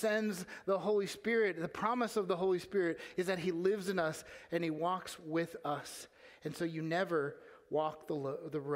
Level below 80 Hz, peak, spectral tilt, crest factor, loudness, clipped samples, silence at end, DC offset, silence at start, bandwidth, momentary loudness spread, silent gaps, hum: -76 dBFS; -18 dBFS; -5.5 dB/octave; 18 dB; -36 LUFS; under 0.1%; 0 s; under 0.1%; 0 s; 16 kHz; 8 LU; none; none